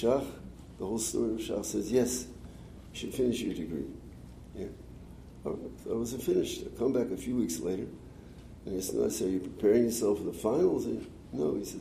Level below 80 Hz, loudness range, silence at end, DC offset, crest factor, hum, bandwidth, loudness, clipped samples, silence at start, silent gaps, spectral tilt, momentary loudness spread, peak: -54 dBFS; 7 LU; 0 s; under 0.1%; 18 dB; none; 15.5 kHz; -32 LUFS; under 0.1%; 0 s; none; -5 dB/octave; 21 LU; -14 dBFS